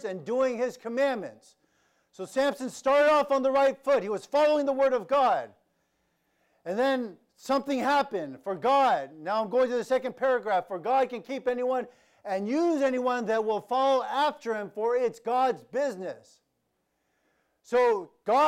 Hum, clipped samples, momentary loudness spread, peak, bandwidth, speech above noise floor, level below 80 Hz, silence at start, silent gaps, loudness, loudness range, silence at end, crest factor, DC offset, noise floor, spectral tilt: none; under 0.1%; 10 LU; -14 dBFS; 15 kHz; 50 dB; -72 dBFS; 0 s; none; -27 LUFS; 5 LU; 0 s; 12 dB; under 0.1%; -77 dBFS; -4.5 dB/octave